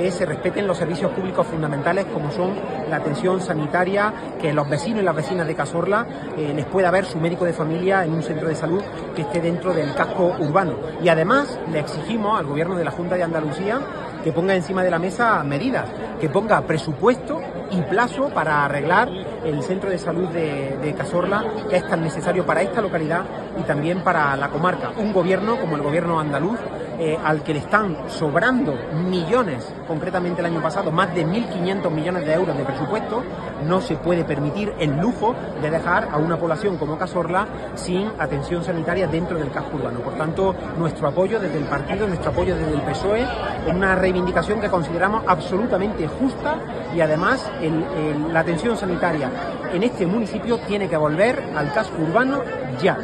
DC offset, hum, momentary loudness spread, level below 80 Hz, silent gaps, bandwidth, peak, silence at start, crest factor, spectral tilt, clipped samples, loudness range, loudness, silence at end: under 0.1%; none; 6 LU; -44 dBFS; none; 10.5 kHz; -2 dBFS; 0 s; 20 dB; -6.5 dB/octave; under 0.1%; 2 LU; -22 LUFS; 0 s